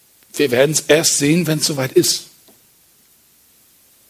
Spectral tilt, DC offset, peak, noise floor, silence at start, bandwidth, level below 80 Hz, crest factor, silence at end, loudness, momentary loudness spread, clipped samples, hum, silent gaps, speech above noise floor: -3.5 dB/octave; under 0.1%; 0 dBFS; -53 dBFS; 0.35 s; 16 kHz; -60 dBFS; 18 dB; 1.85 s; -15 LUFS; 7 LU; under 0.1%; none; none; 38 dB